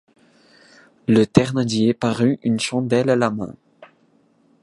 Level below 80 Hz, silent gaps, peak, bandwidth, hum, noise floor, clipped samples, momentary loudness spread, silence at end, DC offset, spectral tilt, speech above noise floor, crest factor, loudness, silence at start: -54 dBFS; none; 0 dBFS; 11.5 kHz; none; -59 dBFS; under 0.1%; 9 LU; 0.75 s; under 0.1%; -6 dB/octave; 41 dB; 20 dB; -19 LUFS; 1.1 s